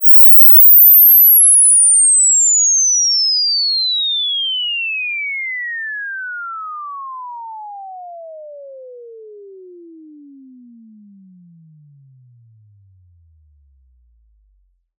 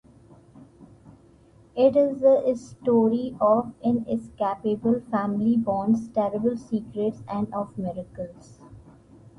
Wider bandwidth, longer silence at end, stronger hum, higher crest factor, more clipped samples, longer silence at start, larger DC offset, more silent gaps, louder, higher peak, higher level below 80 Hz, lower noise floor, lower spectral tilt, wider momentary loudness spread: first, 15 kHz vs 10 kHz; first, 5.95 s vs 0.6 s; neither; about the same, 14 dB vs 18 dB; neither; second, 0 s vs 0.6 s; neither; neither; first, -7 LUFS vs -24 LUFS; first, 0 dBFS vs -8 dBFS; second, -64 dBFS vs -58 dBFS; first, -59 dBFS vs -54 dBFS; second, 3 dB/octave vs -8.5 dB/octave; first, 26 LU vs 12 LU